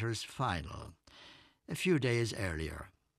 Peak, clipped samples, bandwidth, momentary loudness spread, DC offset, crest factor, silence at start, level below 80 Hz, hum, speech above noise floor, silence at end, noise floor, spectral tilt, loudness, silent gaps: -18 dBFS; under 0.1%; 13.5 kHz; 24 LU; under 0.1%; 18 dB; 0 s; -54 dBFS; none; 24 dB; 0.3 s; -59 dBFS; -5.5 dB/octave; -35 LUFS; none